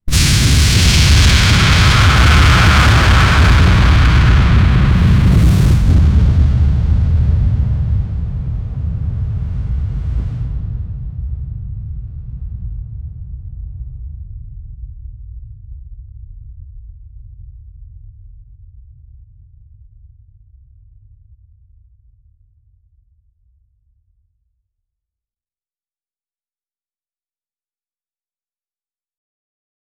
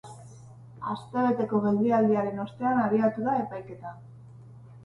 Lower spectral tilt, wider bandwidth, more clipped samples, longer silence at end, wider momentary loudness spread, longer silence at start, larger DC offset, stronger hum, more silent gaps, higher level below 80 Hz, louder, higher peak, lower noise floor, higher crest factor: second, -4.5 dB/octave vs -8.5 dB/octave; first, 17 kHz vs 10.5 kHz; neither; first, 11.2 s vs 0 s; first, 22 LU vs 19 LU; about the same, 0.05 s vs 0.05 s; neither; neither; neither; first, -18 dBFS vs -64 dBFS; first, -12 LUFS vs -26 LUFS; first, 0 dBFS vs -12 dBFS; first, under -90 dBFS vs -48 dBFS; about the same, 14 dB vs 16 dB